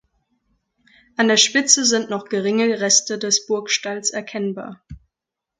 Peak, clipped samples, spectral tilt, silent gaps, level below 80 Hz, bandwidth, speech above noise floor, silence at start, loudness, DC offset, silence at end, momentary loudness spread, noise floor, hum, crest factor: 0 dBFS; under 0.1%; -1.5 dB/octave; none; -56 dBFS; 11 kHz; 65 dB; 1.2 s; -18 LUFS; under 0.1%; 0.6 s; 13 LU; -85 dBFS; none; 22 dB